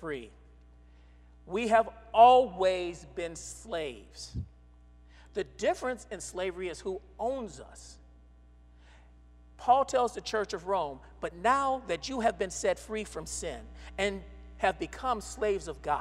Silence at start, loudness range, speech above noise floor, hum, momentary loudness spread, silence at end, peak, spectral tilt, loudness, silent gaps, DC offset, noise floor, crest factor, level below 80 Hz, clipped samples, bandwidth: 0 s; 10 LU; 26 dB; 60 Hz at -55 dBFS; 16 LU; 0 s; -8 dBFS; -4 dB/octave; -30 LUFS; none; under 0.1%; -56 dBFS; 24 dB; -52 dBFS; under 0.1%; 13 kHz